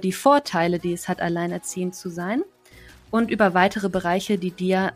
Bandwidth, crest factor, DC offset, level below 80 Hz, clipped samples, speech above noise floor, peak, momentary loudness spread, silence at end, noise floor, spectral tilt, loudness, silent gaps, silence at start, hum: 15.5 kHz; 18 dB; under 0.1%; -56 dBFS; under 0.1%; 26 dB; -4 dBFS; 10 LU; 0 s; -48 dBFS; -5.5 dB/octave; -23 LUFS; none; 0 s; none